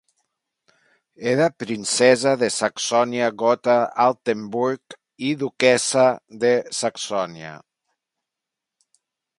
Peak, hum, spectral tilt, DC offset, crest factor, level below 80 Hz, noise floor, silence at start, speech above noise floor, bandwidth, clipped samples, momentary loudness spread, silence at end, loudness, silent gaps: -2 dBFS; none; -3.5 dB/octave; under 0.1%; 20 dB; -70 dBFS; -85 dBFS; 1.2 s; 65 dB; 11.5 kHz; under 0.1%; 10 LU; 1.85 s; -20 LUFS; none